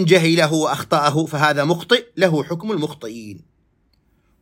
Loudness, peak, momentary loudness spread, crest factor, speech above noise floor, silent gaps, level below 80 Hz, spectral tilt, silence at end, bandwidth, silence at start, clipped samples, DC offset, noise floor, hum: -18 LUFS; -2 dBFS; 16 LU; 18 dB; 44 dB; none; -62 dBFS; -5 dB/octave; 1.05 s; 16.5 kHz; 0 s; under 0.1%; under 0.1%; -62 dBFS; none